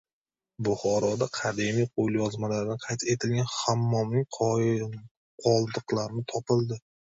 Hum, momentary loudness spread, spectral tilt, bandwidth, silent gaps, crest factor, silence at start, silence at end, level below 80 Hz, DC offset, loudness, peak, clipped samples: none; 6 LU; -5.5 dB/octave; 8 kHz; 5.11-5.38 s; 18 dB; 0.6 s; 0.25 s; -62 dBFS; under 0.1%; -28 LUFS; -10 dBFS; under 0.1%